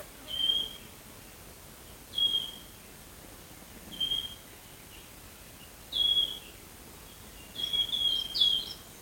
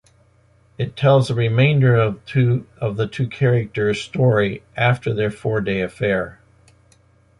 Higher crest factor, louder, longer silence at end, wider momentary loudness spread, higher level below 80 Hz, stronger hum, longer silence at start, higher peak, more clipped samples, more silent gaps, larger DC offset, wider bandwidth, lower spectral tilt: first, 22 dB vs 16 dB; second, -28 LUFS vs -19 LUFS; second, 0 s vs 1.05 s; first, 23 LU vs 8 LU; second, -58 dBFS vs -48 dBFS; neither; second, 0 s vs 0.8 s; second, -12 dBFS vs -4 dBFS; neither; neither; neither; first, 17 kHz vs 11 kHz; second, -1 dB/octave vs -7.5 dB/octave